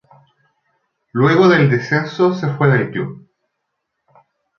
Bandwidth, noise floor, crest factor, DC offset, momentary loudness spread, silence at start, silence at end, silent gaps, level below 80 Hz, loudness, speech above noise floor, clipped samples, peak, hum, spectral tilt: 6.8 kHz; -75 dBFS; 16 dB; under 0.1%; 14 LU; 1.15 s; 1.4 s; none; -58 dBFS; -15 LUFS; 60 dB; under 0.1%; -2 dBFS; none; -8 dB/octave